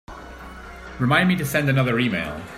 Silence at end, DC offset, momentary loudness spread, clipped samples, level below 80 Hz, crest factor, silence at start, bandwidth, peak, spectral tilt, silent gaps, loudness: 0 s; under 0.1%; 20 LU; under 0.1%; -46 dBFS; 18 dB; 0.1 s; 16 kHz; -4 dBFS; -6 dB/octave; none; -20 LUFS